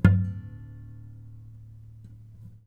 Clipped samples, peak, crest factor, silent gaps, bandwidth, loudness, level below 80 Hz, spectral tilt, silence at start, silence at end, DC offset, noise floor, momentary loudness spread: under 0.1%; -4 dBFS; 26 dB; none; 5.2 kHz; -28 LUFS; -44 dBFS; -9.5 dB/octave; 0.05 s; 1.85 s; under 0.1%; -47 dBFS; 21 LU